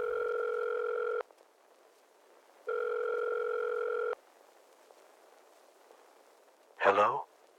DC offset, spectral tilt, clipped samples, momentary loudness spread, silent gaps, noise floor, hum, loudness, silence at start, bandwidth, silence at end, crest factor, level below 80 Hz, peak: under 0.1%; -4 dB/octave; under 0.1%; 11 LU; none; -63 dBFS; none; -33 LUFS; 0 s; 11.5 kHz; 0.35 s; 24 dB; -82 dBFS; -12 dBFS